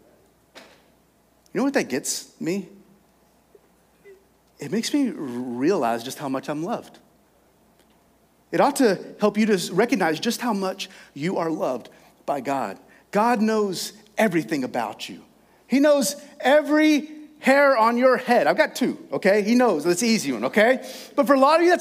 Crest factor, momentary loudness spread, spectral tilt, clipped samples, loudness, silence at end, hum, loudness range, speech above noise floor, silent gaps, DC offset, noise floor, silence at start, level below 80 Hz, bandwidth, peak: 20 dB; 13 LU; -4.5 dB/octave; under 0.1%; -22 LUFS; 0 s; none; 10 LU; 39 dB; none; under 0.1%; -60 dBFS; 0.55 s; -72 dBFS; 16 kHz; -4 dBFS